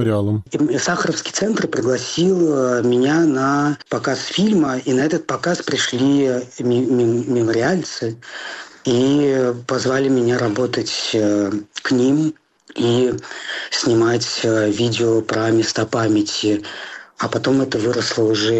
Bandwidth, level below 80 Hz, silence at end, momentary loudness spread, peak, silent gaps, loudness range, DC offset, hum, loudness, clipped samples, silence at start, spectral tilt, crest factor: 8.4 kHz; -58 dBFS; 0 s; 8 LU; -8 dBFS; none; 2 LU; under 0.1%; none; -18 LUFS; under 0.1%; 0 s; -5 dB/octave; 10 dB